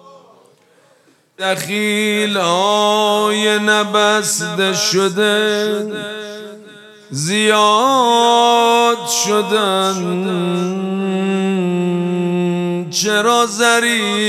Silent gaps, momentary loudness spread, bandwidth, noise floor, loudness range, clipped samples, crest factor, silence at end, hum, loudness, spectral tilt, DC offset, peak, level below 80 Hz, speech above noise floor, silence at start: none; 8 LU; 15.5 kHz; -53 dBFS; 4 LU; under 0.1%; 16 dB; 0 s; none; -15 LUFS; -3.5 dB/octave; under 0.1%; 0 dBFS; -66 dBFS; 38 dB; 0.15 s